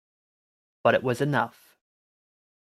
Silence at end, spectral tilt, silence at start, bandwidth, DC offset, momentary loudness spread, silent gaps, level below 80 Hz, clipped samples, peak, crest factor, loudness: 1.25 s; -6.5 dB/octave; 0.85 s; 14.5 kHz; under 0.1%; 5 LU; none; -72 dBFS; under 0.1%; -6 dBFS; 24 dB; -25 LUFS